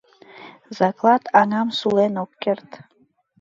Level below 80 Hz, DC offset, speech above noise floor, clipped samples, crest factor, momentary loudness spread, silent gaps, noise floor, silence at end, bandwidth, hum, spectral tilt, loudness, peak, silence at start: -68 dBFS; under 0.1%; 24 dB; under 0.1%; 20 dB; 10 LU; none; -44 dBFS; 0.65 s; 7.8 kHz; none; -6 dB/octave; -20 LUFS; -2 dBFS; 0.35 s